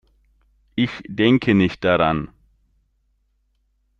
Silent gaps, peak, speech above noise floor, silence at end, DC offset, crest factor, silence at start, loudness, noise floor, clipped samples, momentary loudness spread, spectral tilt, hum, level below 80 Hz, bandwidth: none; -4 dBFS; 48 dB; 1.75 s; under 0.1%; 18 dB; 0.75 s; -19 LUFS; -66 dBFS; under 0.1%; 11 LU; -7.5 dB/octave; none; -50 dBFS; 7.4 kHz